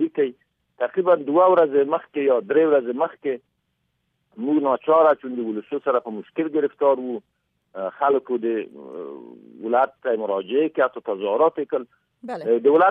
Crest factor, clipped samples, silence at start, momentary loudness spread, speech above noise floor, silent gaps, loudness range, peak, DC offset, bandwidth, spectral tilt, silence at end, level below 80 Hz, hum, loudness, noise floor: 16 dB; under 0.1%; 0 s; 16 LU; 52 dB; none; 5 LU; -6 dBFS; under 0.1%; 4.6 kHz; -8.5 dB/octave; 0 s; -76 dBFS; none; -21 LUFS; -73 dBFS